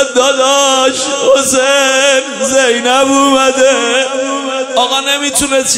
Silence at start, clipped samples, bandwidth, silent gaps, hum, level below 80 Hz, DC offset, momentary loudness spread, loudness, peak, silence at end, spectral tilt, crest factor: 0 s; under 0.1%; 16 kHz; none; none; -48 dBFS; under 0.1%; 4 LU; -10 LUFS; 0 dBFS; 0 s; -0.5 dB/octave; 10 dB